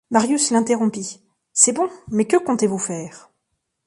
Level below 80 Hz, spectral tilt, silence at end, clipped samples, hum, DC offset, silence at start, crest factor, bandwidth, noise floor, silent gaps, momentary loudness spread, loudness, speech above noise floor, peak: -62 dBFS; -3.5 dB/octave; 0.7 s; under 0.1%; none; under 0.1%; 0.1 s; 20 dB; 11.5 kHz; -75 dBFS; none; 15 LU; -19 LUFS; 56 dB; 0 dBFS